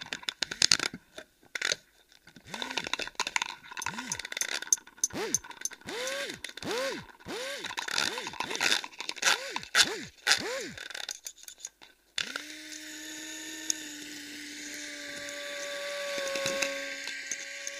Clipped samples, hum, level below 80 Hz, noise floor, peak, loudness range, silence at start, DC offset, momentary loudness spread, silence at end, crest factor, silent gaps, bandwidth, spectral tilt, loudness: under 0.1%; none; -68 dBFS; -61 dBFS; 0 dBFS; 9 LU; 0 s; under 0.1%; 14 LU; 0 s; 34 dB; none; 15.5 kHz; 0 dB/octave; -32 LUFS